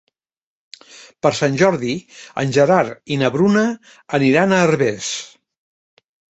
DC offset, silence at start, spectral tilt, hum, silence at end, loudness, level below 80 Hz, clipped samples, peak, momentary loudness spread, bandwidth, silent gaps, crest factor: under 0.1%; 1 s; -5.5 dB/octave; none; 1.05 s; -17 LUFS; -58 dBFS; under 0.1%; -2 dBFS; 13 LU; 8.2 kHz; none; 18 dB